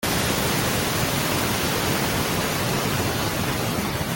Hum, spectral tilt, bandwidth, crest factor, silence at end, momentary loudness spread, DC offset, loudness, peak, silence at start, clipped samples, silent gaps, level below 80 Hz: none; -3.5 dB/octave; 17 kHz; 14 dB; 0 s; 2 LU; under 0.1%; -22 LUFS; -8 dBFS; 0 s; under 0.1%; none; -42 dBFS